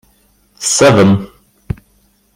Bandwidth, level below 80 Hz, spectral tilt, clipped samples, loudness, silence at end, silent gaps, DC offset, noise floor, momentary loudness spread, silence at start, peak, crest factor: 16 kHz; -40 dBFS; -4.5 dB/octave; under 0.1%; -11 LUFS; 1.1 s; none; under 0.1%; -54 dBFS; 19 LU; 0.6 s; 0 dBFS; 14 dB